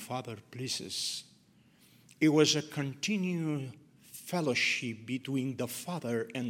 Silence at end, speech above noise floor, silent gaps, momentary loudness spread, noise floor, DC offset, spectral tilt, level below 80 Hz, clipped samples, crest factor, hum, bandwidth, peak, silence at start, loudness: 0 s; 31 dB; none; 14 LU; -64 dBFS; under 0.1%; -4 dB/octave; -78 dBFS; under 0.1%; 22 dB; none; 17 kHz; -12 dBFS; 0 s; -32 LUFS